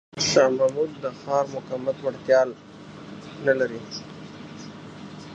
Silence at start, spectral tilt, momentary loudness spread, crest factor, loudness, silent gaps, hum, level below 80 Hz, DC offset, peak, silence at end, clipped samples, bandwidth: 0.15 s; -3.5 dB/octave; 21 LU; 20 dB; -24 LUFS; none; none; -62 dBFS; under 0.1%; -6 dBFS; 0 s; under 0.1%; 8.4 kHz